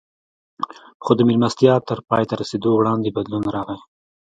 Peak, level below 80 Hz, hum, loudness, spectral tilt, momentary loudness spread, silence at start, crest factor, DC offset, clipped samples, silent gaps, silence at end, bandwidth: 0 dBFS; -56 dBFS; none; -19 LUFS; -7 dB/octave; 15 LU; 0.6 s; 20 dB; under 0.1%; under 0.1%; 0.94-1.00 s; 0.45 s; 9 kHz